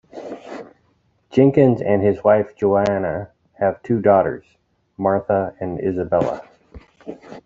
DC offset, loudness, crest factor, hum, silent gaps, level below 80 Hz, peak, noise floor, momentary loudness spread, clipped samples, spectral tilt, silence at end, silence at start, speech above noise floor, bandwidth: under 0.1%; -19 LUFS; 18 dB; none; none; -54 dBFS; -2 dBFS; -62 dBFS; 21 LU; under 0.1%; -9 dB/octave; 0.05 s; 0.15 s; 44 dB; 7.6 kHz